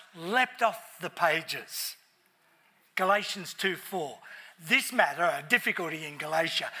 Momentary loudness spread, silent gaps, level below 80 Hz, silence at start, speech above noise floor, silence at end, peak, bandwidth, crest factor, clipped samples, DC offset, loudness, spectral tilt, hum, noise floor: 12 LU; none; under -90 dBFS; 0 s; 37 dB; 0 s; -8 dBFS; 16 kHz; 24 dB; under 0.1%; under 0.1%; -29 LUFS; -2.5 dB/octave; none; -67 dBFS